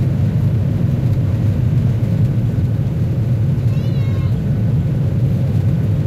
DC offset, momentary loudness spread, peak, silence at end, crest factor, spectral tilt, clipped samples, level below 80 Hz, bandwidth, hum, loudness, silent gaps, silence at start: under 0.1%; 2 LU; -6 dBFS; 0 s; 10 dB; -9.5 dB/octave; under 0.1%; -32 dBFS; 12.5 kHz; none; -17 LUFS; none; 0 s